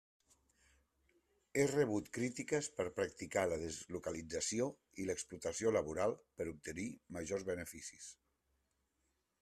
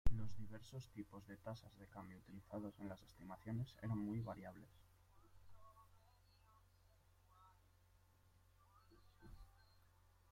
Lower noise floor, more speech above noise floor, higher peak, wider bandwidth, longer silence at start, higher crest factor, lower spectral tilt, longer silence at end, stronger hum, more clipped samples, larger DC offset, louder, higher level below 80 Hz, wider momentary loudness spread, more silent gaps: first, -83 dBFS vs -73 dBFS; first, 44 dB vs 22 dB; about the same, -22 dBFS vs -22 dBFS; second, 14 kHz vs 15.5 kHz; first, 1.55 s vs 0.05 s; second, 20 dB vs 26 dB; second, -4.5 dB/octave vs -7.5 dB/octave; first, 1.3 s vs 0.8 s; neither; neither; neither; first, -40 LUFS vs -52 LUFS; second, -70 dBFS vs -60 dBFS; second, 10 LU vs 21 LU; neither